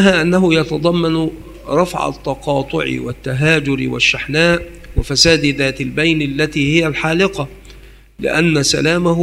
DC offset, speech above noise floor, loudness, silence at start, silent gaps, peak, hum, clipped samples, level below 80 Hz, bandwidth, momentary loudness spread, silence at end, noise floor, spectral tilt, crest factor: under 0.1%; 25 dB; -15 LUFS; 0 s; none; 0 dBFS; none; under 0.1%; -34 dBFS; 16 kHz; 11 LU; 0 s; -40 dBFS; -4.5 dB/octave; 16 dB